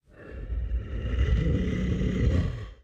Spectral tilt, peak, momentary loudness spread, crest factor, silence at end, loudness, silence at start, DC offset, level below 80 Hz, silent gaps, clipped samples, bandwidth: -8 dB/octave; -12 dBFS; 10 LU; 14 dB; 0.1 s; -29 LUFS; 0.15 s; under 0.1%; -30 dBFS; none; under 0.1%; 7.4 kHz